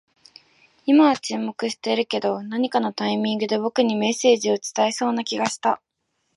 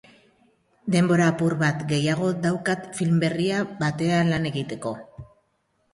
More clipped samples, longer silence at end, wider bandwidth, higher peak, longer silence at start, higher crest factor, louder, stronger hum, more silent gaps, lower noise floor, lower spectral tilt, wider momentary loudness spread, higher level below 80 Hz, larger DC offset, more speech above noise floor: neither; about the same, 0.6 s vs 0.7 s; about the same, 11.5 kHz vs 11.5 kHz; first, -4 dBFS vs -8 dBFS; about the same, 0.85 s vs 0.85 s; about the same, 18 dB vs 16 dB; about the same, -22 LUFS vs -23 LUFS; neither; neither; about the same, -73 dBFS vs -70 dBFS; second, -4 dB/octave vs -6 dB/octave; about the same, 8 LU vs 10 LU; second, -74 dBFS vs -58 dBFS; neither; first, 52 dB vs 47 dB